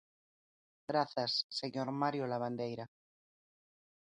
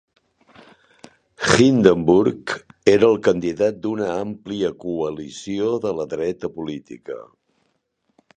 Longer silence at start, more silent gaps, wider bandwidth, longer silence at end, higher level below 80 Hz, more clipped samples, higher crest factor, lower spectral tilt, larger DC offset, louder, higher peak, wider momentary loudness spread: second, 0.9 s vs 1.4 s; first, 1.44-1.49 s vs none; about the same, 11 kHz vs 10 kHz; first, 1.25 s vs 1.1 s; second, -82 dBFS vs -52 dBFS; neither; about the same, 20 dB vs 20 dB; about the same, -5.5 dB/octave vs -5.5 dB/octave; neither; second, -37 LUFS vs -20 LUFS; second, -18 dBFS vs 0 dBFS; second, 11 LU vs 16 LU